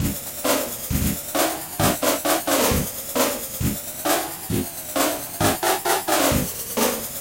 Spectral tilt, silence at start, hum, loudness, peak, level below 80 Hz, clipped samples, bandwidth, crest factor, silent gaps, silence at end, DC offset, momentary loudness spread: -3.5 dB/octave; 0 s; none; -22 LUFS; -6 dBFS; -38 dBFS; under 0.1%; 17 kHz; 18 dB; none; 0 s; under 0.1%; 6 LU